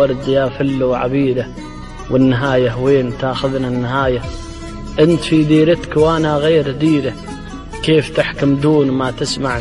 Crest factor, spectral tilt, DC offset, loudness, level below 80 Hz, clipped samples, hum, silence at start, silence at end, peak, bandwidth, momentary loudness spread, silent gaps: 14 dB; -6.5 dB/octave; under 0.1%; -15 LUFS; -34 dBFS; under 0.1%; none; 0 s; 0 s; -2 dBFS; 11.5 kHz; 16 LU; none